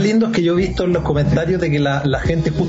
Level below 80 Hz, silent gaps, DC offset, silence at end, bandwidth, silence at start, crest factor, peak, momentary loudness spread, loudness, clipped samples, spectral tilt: -32 dBFS; none; under 0.1%; 0 s; 8 kHz; 0 s; 12 dB; -4 dBFS; 3 LU; -17 LUFS; under 0.1%; -7 dB/octave